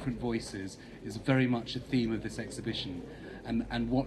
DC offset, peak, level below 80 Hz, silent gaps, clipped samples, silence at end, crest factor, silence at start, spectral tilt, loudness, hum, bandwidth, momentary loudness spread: under 0.1%; -14 dBFS; -52 dBFS; none; under 0.1%; 0 s; 18 dB; 0 s; -6 dB/octave; -34 LUFS; none; 12.5 kHz; 15 LU